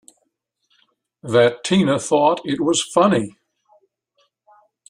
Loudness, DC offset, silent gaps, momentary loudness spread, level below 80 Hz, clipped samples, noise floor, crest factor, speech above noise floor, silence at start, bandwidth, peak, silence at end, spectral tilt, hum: -18 LUFS; under 0.1%; none; 6 LU; -60 dBFS; under 0.1%; -72 dBFS; 18 dB; 55 dB; 1.25 s; 11.5 kHz; -2 dBFS; 1.6 s; -4.5 dB/octave; none